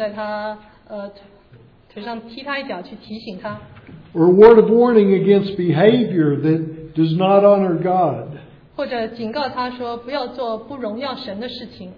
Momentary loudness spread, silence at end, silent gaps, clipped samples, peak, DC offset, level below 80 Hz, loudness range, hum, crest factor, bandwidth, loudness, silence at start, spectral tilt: 20 LU; 0.05 s; none; under 0.1%; 0 dBFS; under 0.1%; -52 dBFS; 16 LU; none; 18 dB; 5.2 kHz; -16 LUFS; 0 s; -9.5 dB/octave